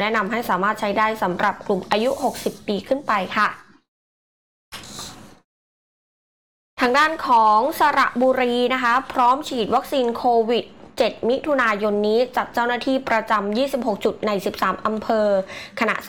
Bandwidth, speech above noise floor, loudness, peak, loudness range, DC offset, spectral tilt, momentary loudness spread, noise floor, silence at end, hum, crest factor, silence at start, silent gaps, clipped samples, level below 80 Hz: 19 kHz; over 70 dB; -20 LUFS; -8 dBFS; 8 LU; 0.3%; -4.5 dB/octave; 8 LU; under -90 dBFS; 0 s; none; 12 dB; 0 s; 3.88-4.72 s, 5.45-6.77 s; under 0.1%; -56 dBFS